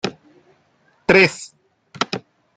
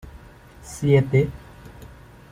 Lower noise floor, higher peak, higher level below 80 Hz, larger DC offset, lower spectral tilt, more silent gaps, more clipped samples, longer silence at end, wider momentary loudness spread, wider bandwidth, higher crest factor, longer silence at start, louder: first, -60 dBFS vs -46 dBFS; about the same, -2 dBFS vs -4 dBFS; second, -56 dBFS vs -46 dBFS; neither; second, -4.5 dB/octave vs -7.5 dB/octave; neither; neither; second, 0.4 s vs 0.65 s; second, 21 LU vs 26 LU; second, 9.4 kHz vs 14.5 kHz; about the same, 20 dB vs 20 dB; about the same, 0.05 s vs 0.05 s; first, -18 LUFS vs -21 LUFS